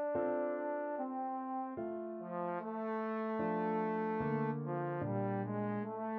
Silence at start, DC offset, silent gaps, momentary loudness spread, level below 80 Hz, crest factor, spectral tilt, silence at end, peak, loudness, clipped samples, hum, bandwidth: 0 s; under 0.1%; none; 5 LU; -74 dBFS; 12 dB; -8 dB/octave; 0 s; -26 dBFS; -38 LUFS; under 0.1%; none; 4.6 kHz